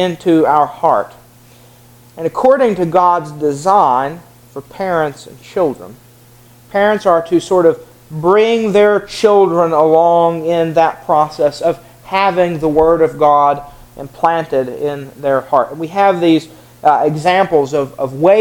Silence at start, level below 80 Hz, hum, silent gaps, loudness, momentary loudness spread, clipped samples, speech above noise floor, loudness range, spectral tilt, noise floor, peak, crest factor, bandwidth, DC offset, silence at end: 0 s; -48 dBFS; none; none; -13 LUFS; 12 LU; under 0.1%; 30 dB; 5 LU; -6 dB/octave; -43 dBFS; 0 dBFS; 14 dB; 18.5 kHz; under 0.1%; 0 s